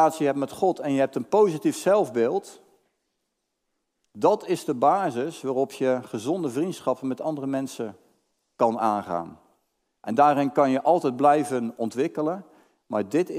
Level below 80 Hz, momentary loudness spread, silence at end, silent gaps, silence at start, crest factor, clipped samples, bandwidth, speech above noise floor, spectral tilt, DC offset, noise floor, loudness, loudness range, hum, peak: -76 dBFS; 9 LU; 0 s; none; 0 s; 20 dB; under 0.1%; 16 kHz; 55 dB; -6 dB/octave; under 0.1%; -79 dBFS; -24 LUFS; 5 LU; none; -6 dBFS